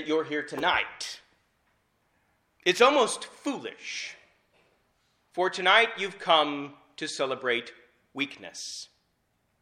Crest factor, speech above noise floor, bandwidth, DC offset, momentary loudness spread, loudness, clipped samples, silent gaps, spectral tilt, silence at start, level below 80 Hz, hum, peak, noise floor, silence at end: 24 dB; 46 dB; 14.5 kHz; under 0.1%; 19 LU; -27 LUFS; under 0.1%; none; -2 dB/octave; 0 s; -70 dBFS; none; -6 dBFS; -73 dBFS; 0.75 s